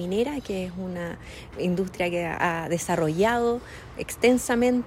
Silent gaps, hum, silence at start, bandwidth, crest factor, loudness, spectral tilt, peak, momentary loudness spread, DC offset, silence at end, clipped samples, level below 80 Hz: none; none; 0 s; 16 kHz; 18 dB; -26 LUFS; -5 dB/octave; -8 dBFS; 13 LU; under 0.1%; 0 s; under 0.1%; -50 dBFS